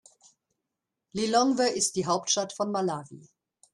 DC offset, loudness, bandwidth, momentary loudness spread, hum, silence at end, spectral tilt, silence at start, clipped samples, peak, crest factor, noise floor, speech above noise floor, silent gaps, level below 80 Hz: under 0.1%; -27 LUFS; 12.5 kHz; 8 LU; none; 0.55 s; -3 dB/octave; 1.15 s; under 0.1%; -10 dBFS; 20 dB; -86 dBFS; 59 dB; none; -70 dBFS